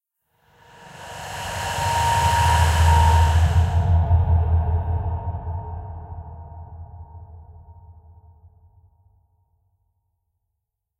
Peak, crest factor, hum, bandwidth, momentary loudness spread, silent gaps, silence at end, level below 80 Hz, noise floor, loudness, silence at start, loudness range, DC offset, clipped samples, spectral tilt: -4 dBFS; 18 dB; none; 14 kHz; 23 LU; none; 3.05 s; -28 dBFS; -80 dBFS; -20 LUFS; 0.85 s; 19 LU; under 0.1%; under 0.1%; -5 dB/octave